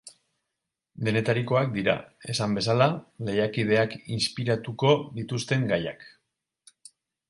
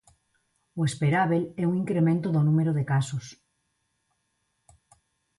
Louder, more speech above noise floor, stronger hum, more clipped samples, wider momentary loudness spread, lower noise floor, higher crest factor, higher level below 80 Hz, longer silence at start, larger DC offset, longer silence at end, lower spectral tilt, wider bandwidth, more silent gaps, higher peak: about the same, -26 LUFS vs -25 LUFS; first, 59 dB vs 51 dB; neither; neither; second, 8 LU vs 11 LU; first, -85 dBFS vs -76 dBFS; first, 22 dB vs 16 dB; about the same, -60 dBFS vs -64 dBFS; second, 0.05 s vs 0.75 s; neither; second, 1.2 s vs 2.05 s; second, -5.5 dB/octave vs -7.5 dB/octave; about the same, 11.5 kHz vs 11.5 kHz; neither; first, -6 dBFS vs -12 dBFS